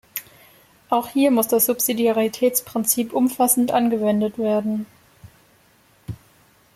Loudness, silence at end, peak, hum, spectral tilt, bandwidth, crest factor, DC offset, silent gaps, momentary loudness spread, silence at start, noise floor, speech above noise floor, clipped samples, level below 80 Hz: -20 LUFS; 0.6 s; -2 dBFS; none; -4 dB/octave; 16.5 kHz; 20 dB; under 0.1%; none; 17 LU; 0.15 s; -57 dBFS; 37 dB; under 0.1%; -60 dBFS